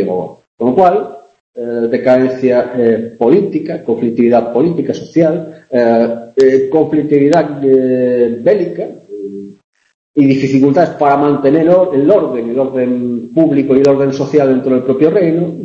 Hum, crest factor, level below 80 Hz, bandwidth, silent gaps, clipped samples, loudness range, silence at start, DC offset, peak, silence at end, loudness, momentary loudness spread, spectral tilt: none; 12 dB; -54 dBFS; 8 kHz; 0.47-0.58 s, 1.40-1.53 s, 9.64-9.73 s, 9.94-10.14 s; under 0.1%; 2 LU; 0 s; under 0.1%; 0 dBFS; 0 s; -12 LUFS; 9 LU; -8.5 dB/octave